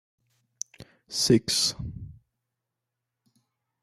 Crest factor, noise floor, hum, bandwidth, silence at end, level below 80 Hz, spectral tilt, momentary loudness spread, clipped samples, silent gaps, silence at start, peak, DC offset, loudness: 24 dB; -85 dBFS; none; 15 kHz; 1.7 s; -54 dBFS; -3.5 dB/octave; 18 LU; under 0.1%; none; 0.8 s; -8 dBFS; under 0.1%; -24 LUFS